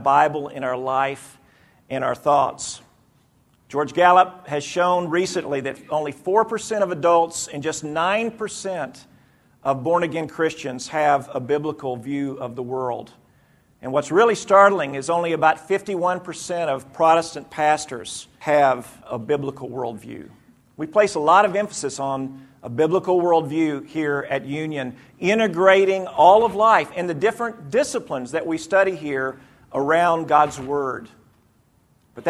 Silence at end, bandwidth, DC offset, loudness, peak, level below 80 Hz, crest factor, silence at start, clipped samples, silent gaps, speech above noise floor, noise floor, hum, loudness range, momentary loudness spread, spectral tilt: 0 s; 13.5 kHz; under 0.1%; -21 LUFS; 0 dBFS; -62 dBFS; 20 dB; 0 s; under 0.1%; none; 39 dB; -60 dBFS; none; 6 LU; 14 LU; -4.5 dB/octave